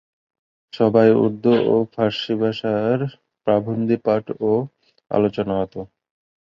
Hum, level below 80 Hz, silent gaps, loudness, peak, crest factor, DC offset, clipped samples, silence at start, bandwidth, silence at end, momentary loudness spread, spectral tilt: none; -56 dBFS; none; -20 LUFS; -2 dBFS; 18 dB; under 0.1%; under 0.1%; 0.75 s; 7 kHz; 0.7 s; 13 LU; -8.5 dB/octave